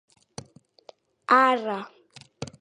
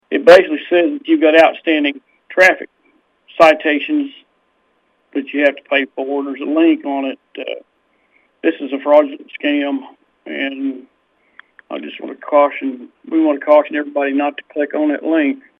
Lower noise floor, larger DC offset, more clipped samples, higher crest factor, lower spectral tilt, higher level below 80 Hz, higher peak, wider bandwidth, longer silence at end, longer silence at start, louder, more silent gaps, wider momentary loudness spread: second, -54 dBFS vs -62 dBFS; neither; second, under 0.1% vs 0.1%; first, 24 dB vs 16 dB; about the same, -4.5 dB/octave vs -4.5 dB/octave; about the same, -66 dBFS vs -62 dBFS; second, -4 dBFS vs 0 dBFS; about the same, 10.5 kHz vs 11 kHz; about the same, 0.15 s vs 0.2 s; first, 1.3 s vs 0.1 s; second, -22 LUFS vs -15 LUFS; neither; first, 25 LU vs 17 LU